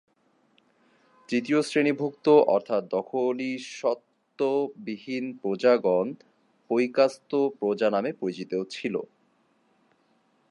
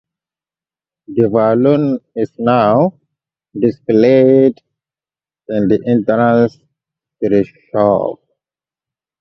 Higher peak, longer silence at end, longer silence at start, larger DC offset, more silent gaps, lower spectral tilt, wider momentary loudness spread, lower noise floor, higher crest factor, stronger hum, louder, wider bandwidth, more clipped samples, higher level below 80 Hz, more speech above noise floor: second, -8 dBFS vs 0 dBFS; first, 1.45 s vs 1.05 s; first, 1.3 s vs 1.1 s; neither; neither; second, -5.5 dB/octave vs -9.5 dB/octave; about the same, 12 LU vs 11 LU; second, -67 dBFS vs under -90 dBFS; first, 20 dB vs 14 dB; neither; second, -26 LUFS vs -14 LUFS; first, 11 kHz vs 6.2 kHz; neither; second, -82 dBFS vs -54 dBFS; second, 42 dB vs over 78 dB